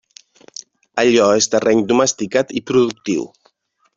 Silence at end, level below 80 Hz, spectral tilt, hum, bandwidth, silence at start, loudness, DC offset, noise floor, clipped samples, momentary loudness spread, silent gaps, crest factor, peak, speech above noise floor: 0.7 s; -58 dBFS; -3.5 dB/octave; none; 7.8 kHz; 0.95 s; -16 LUFS; under 0.1%; -60 dBFS; under 0.1%; 22 LU; none; 16 dB; -2 dBFS; 44 dB